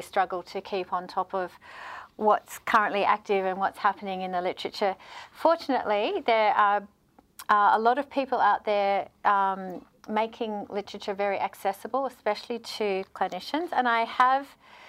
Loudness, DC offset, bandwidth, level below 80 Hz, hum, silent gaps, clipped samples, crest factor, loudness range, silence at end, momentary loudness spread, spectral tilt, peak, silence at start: -27 LUFS; under 0.1%; 16 kHz; -70 dBFS; none; none; under 0.1%; 18 dB; 6 LU; 0 s; 12 LU; -4.5 dB/octave; -8 dBFS; 0 s